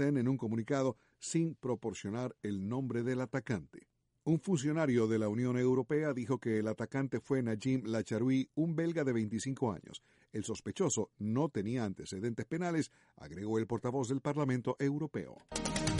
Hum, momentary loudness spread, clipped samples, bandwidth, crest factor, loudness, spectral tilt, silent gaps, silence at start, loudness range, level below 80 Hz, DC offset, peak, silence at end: none; 8 LU; under 0.1%; 11.5 kHz; 16 dB; -35 LUFS; -6 dB/octave; none; 0 s; 4 LU; -62 dBFS; under 0.1%; -18 dBFS; 0 s